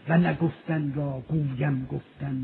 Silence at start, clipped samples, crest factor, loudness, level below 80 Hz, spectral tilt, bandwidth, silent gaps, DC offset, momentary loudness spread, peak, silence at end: 0.05 s; under 0.1%; 16 dB; -28 LUFS; -54 dBFS; -11.5 dB/octave; 4.2 kHz; none; under 0.1%; 10 LU; -10 dBFS; 0 s